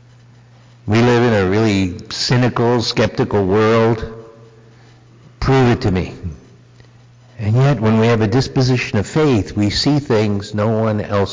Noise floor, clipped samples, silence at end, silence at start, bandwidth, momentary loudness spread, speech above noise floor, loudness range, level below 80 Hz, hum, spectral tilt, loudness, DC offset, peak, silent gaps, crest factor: -45 dBFS; under 0.1%; 0 s; 0.85 s; 7.6 kHz; 9 LU; 30 dB; 4 LU; -36 dBFS; none; -6.5 dB/octave; -16 LUFS; under 0.1%; -8 dBFS; none; 8 dB